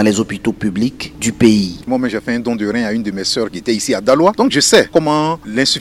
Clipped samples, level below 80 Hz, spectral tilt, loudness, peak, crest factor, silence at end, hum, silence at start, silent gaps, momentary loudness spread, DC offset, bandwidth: 0.1%; -44 dBFS; -4 dB/octave; -15 LUFS; 0 dBFS; 14 dB; 0 s; none; 0 s; none; 8 LU; under 0.1%; 15.5 kHz